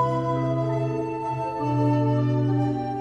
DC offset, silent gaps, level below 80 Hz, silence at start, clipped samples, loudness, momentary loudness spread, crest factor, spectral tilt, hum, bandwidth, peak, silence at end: under 0.1%; none; -54 dBFS; 0 s; under 0.1%; -24 LUFS; 6 LU; 12 dB; -9.5 dB/octave; none; 6.6 kHz; -12 dBFS; 0 s